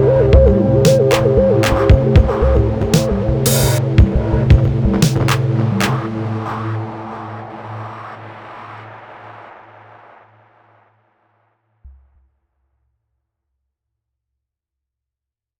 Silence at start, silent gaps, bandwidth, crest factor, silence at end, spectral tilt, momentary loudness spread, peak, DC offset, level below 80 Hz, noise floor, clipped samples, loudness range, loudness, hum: 0 s; none; over 20 kHz; 14 dB; 3.7 s; -6.5 dB/octave; 22 LU; -2 dBFS; under 0.1%; -24 dBFS; -86 dBFS; under 0.1%; 21 LU; -14 LUFS; none